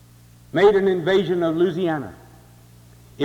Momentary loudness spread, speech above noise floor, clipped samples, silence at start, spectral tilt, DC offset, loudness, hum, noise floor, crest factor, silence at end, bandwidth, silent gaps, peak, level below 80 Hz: 12 LU; 30 dB; under 0.1%; 0.55 s; -7 dB/octave; under 0.1%; -20 LUFS; none; -49 dBFS; 16 dB; 0 s; 11.5 kHz; none; -4 dBFS; -54 dBFS